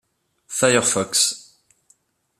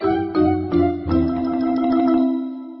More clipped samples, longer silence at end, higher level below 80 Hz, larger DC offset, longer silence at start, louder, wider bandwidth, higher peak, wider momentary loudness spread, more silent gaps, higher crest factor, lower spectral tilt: neither; first, 1 s vs 0 s; second, -64 dBFS vs -40 dBFS; neither; first, 0.5 s vs 0 s; about the same, -18 LUFS vs -19 LUFS; first, 14.5 kHz vs 5.8 kHz; first, -2 dBFS vs -6 dBFS; first, 12 LU vs 4 LU; neither; first, 22 dB vs 12 dB; second, -2 dB/octave vs -12.5 dB/octave